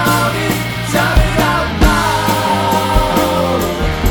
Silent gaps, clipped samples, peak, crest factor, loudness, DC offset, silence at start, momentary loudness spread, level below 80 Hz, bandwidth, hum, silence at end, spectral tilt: none; under 0.1%; 0 dBFS; 14 dB; -14 LUFS; under 0.1%; 0 s; 4 LU; -20 dBFS; 19.5 kHz; none; 0 s; -5 dB/octave